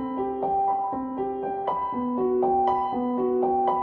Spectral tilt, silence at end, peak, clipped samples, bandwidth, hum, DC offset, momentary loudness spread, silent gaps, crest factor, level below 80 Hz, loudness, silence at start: -9.5 dB/octave; 0 s; -10 dBFS; under 0.1%; 4.3 kHz; none; under 0.1%; 6 LU; none; 14 dB; -56 dBFS; -26 LUFS; 0 s